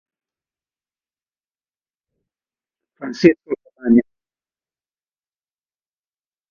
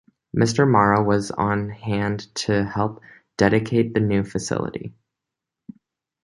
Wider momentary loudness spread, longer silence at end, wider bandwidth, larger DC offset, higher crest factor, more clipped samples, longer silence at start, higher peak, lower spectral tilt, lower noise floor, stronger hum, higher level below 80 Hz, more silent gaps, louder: first, 16 LU vs 11 LU; first, 2.5 s vs 1.35 s; second, 7 kHz vs 11.5 kHz; neither; about the same, 24 dB vs 20 dB; neither; first, 3 s vs 0.35 s; about the same, 0 dBFS vs -2 dBFS; about the same, -7 dB/octave vs -6 dB/octave; first, under -90 dBFS vs -85 dBFS; neither; second, -62 dBFS vs -48 dBFS; neither; first, -17 LUFS vs -21 LUFS